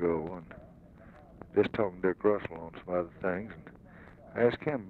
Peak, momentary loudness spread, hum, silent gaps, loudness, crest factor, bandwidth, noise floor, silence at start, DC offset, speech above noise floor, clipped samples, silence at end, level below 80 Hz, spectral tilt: -12 dBFS; 23 LU; none; none; -32 LUFS; 20 dB; 4.9 kHz; -54 dBFS; 0 s; under 0.1%; 22 dB; under 0.1%; 0 s; -60 dBFS; -9 dB/octave